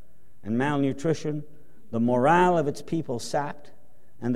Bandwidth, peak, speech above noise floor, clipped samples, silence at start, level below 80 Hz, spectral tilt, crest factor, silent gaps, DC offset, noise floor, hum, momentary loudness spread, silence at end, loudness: 14 kHz; -8 dBFS; 20 dB; under 0.1%; 0.45 s; -62 dBFS; -6.5 dB/octave; 20 dB; none; 2%; -45 dBFS; none; 15 LU; 0 s; -26 LUFS